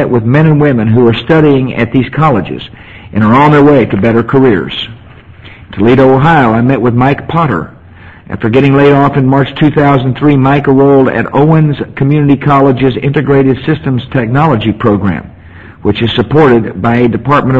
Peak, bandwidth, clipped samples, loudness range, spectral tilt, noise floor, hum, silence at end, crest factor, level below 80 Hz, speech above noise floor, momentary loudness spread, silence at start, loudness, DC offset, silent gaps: 0 dBFS; 5.8 kHz; 0.8%; 3 LU; -9 dB/octave; -33 dBFS; none; 0 s; 8 dB; -34 dBFS; 26 dB; 8 LU; 0 s; -8 LUFS; under 0.1%; none